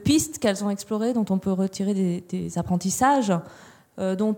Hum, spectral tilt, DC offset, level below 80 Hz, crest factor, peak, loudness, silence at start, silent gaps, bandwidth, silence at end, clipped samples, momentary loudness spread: none; -5.5 dB/octave; under 0.1%; -54 dBFS; 18 dB; -6 dBFS; -24 LUFS; 0 s; none; 17.5 kHz; 0 s; under 0.1%; 8 LU